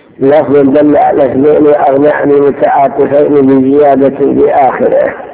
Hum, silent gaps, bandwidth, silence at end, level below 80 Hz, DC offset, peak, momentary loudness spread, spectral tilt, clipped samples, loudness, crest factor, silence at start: none; none; 4 kHz; 0 s; -44 dBFS; under 0.1%; 0 dBFS; 3 LU; -11.5 dB/octave; 3%; -7 LUFS; 6 dB; 0.2 s